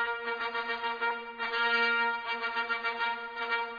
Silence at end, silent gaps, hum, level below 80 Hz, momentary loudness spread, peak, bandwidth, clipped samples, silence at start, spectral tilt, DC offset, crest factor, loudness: 0 s; none; none; -72 dBFS; 7 LU; -16 dBFS; 5 kHz; under 0.1%; 0 s; -2.5 dB/octave; under 0.1%; 16 dB; -31 LUFS